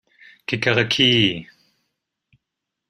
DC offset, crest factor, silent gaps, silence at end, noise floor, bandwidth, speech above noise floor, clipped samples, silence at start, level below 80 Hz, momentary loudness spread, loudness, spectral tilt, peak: under 0.1%; 22 dB; none; 1.45 s; -82 dBFS; 12 kHz; 63 dB; under 0.1%; 0.5 s; -56 dBFS; 17 LU; -18 LUFS; -4.5 dB/octave; -2 dBFS